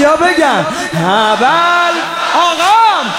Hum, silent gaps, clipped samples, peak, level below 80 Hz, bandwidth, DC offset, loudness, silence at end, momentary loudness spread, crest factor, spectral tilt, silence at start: none; none; under 0.1%; 0 dBFS; -50 dBFS; 16.5 kHz; under 0.1%; -10 LUFS; 0 s; 6 LU; 10 dB; -3.5 dB/octave; 0 s